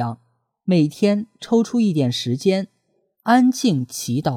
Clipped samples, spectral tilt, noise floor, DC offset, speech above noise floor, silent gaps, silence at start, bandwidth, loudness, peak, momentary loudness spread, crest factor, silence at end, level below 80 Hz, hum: under 0.1%; -6 dB/octave; -67 dBFS; under 0.1%; 48 dB; none; 0 s; 15.5 kHz; -20 LUFS; -4 dBFS; 13 LU; 16 dB; 0 s; -64 dBFS; none